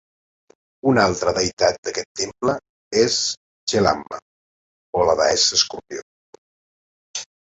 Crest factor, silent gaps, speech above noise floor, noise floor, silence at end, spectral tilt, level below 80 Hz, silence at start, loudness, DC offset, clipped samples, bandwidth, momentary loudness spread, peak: 20 dB; 1.53-1.57 s, 1.78-1.83 s, 2.05-2.15 s, 2.69-2.91 s, 3.37-3.67 s, 4.22-4.93 s, 6.02-7.14 s; over 70 dB; under -90 dBFS; 0.15 s; -3 dB/octave; -50 dBFS; 0.85 s; -20 LUFS; under 0.1%; under 0.1%; 8.2 kHz; 16 LU; -2 dBFS